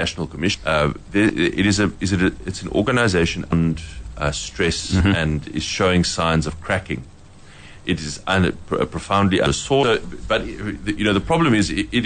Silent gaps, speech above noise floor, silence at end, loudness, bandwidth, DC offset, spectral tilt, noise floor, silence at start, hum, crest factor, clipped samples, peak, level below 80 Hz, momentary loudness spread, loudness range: none; 23 dB; 0 s; -20 LUFS; 9.6 kHz; under 0.1%; -5 dB/octave; -42 dBFS; 0 s; none; 14 dB; under 0.1%; -6 dBFS; -36 dBFS; 7 LU; 3 LU